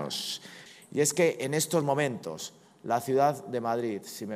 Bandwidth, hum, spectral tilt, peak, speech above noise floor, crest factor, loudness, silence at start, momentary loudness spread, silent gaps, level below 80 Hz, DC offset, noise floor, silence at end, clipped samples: 15.5 kHz; none; -4 dB/octave; -12 dBFS; 21 dB; 18 dB; -29 LUFS; 0 s; 15 LU; none; -78 dBFS; under 0.1%; -49 dBFS; 0 s; under 0.1%